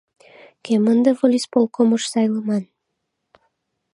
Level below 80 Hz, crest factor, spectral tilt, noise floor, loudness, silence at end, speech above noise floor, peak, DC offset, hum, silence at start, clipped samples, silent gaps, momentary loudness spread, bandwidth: -74 dBFS; 18 dB; -5.5 dB/octave; -76 dBFS; -19 LUFS; 1.3 s; 59 dB; -2 dBFS; under 0.1%; none; 0.65 s; under 0.1%; none; 8 LU; 11.5 kHz